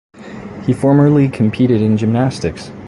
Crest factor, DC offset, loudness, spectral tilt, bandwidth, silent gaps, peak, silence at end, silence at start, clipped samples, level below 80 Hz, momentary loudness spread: 12 dB; under 0.1%; -14 LUFS; -8 dB/octave; 11.5 kHz; none; -2 dBFS; 0 s; 0.15 s; under 0.1%; -42 dBFS; 17 LU